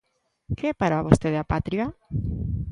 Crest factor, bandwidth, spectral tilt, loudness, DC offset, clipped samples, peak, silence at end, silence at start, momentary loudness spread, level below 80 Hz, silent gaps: 24 dB; 11.5 kHz; -7.5 dB/octave; -25 LUFS; under 0.1%; under 0.1%; 0 dBFS; 0 s; 0.5 s; 9 LU; -38 dBFS; none